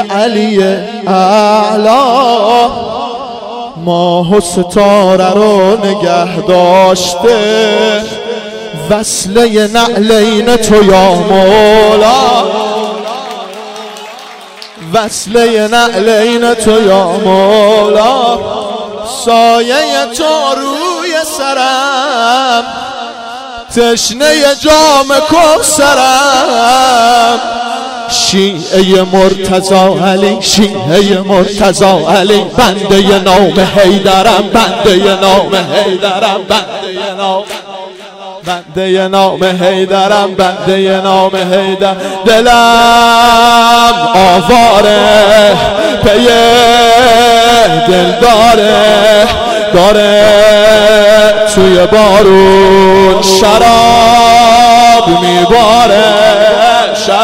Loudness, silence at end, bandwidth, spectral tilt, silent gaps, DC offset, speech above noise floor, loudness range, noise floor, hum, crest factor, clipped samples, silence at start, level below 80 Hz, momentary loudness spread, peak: -6 LUFS; 0 s; 16.5 kHz; -3.5 dB/octave; none; under 0.1%; 22 dB; 7 LU; -29 dBFS; none; 6 dB; 0.6%; 0 s; -32 dBFS; 12 LU; 0 dBFS